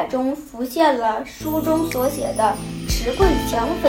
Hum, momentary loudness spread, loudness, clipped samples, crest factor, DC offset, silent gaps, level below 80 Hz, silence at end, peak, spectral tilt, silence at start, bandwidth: none; 8 LU; -21 LUFS; under 0.1%; 18 dB; under 0.1%; none; -32 dBFS; 0 s; -2 dBFS; -5 dB/octave; 0 s; 19 kHz